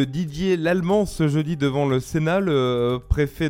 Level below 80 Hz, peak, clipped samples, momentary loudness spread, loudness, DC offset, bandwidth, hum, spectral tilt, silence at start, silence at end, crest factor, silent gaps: -36 dBFS; -6 dBFS; under 0.1%; 3 LU; -22 LUFS; under 0.1%; 16.5 kHz; none; -7 dB/octave; 0 s; 0 s; 16 dB; none